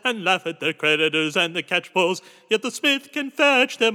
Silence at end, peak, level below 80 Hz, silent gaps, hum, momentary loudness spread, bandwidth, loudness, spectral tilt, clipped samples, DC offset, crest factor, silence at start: 0 s; -6 dBFS; under -90 dBFS; none; none; 7 LU; 18 kHz; -21 LUFS; -3 dB/octave; under 0.1%; under 0.1%; 16 dB; 0.05 s